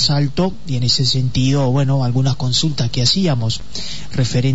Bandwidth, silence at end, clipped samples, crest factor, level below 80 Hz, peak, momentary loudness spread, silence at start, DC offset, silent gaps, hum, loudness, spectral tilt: 8 kHz; 0 s; under 0.1%; 14 dB; -40 dBFS; -2 dBFS; 7 LU; 0 s; 6%; none; none; -17 LUFS; -5 dB/octave